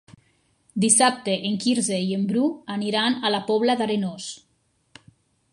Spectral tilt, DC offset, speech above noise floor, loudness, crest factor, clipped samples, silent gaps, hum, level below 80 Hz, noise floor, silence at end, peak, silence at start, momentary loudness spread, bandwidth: -3.5 dB/octave; under 0.1%; 45 dB; -22 LUFS; 20 dB; under 0.1%; none; none; -70 dBFS; -68 dBFS; 1.15 s; -6 dBFS; 0.75 s; 14 LU; 11.5 kHz